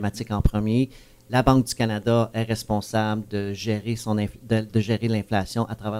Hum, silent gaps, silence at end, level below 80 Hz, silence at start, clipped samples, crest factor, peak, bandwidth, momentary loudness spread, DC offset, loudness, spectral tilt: none; none; 0 s; -36 dBFS; 0 s; under 0.1%; 20 dB; -4 dBFS; 16 kHz; 7 LU; under 0.1%; -24 LUFS; -6.5 dB/octave